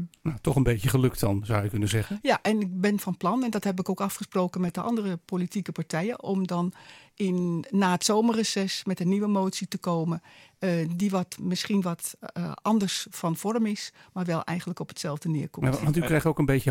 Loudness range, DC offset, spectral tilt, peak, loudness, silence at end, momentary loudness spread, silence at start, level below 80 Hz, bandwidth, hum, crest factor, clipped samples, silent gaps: 3 LU; under 0.1%; -5.5 dB/octave; -8 dBFS; -27 LUFS; 0 s; 8 LU; 0 s; -50 dBFS; 17 kHz; none; 18 dB; under 0.1%; none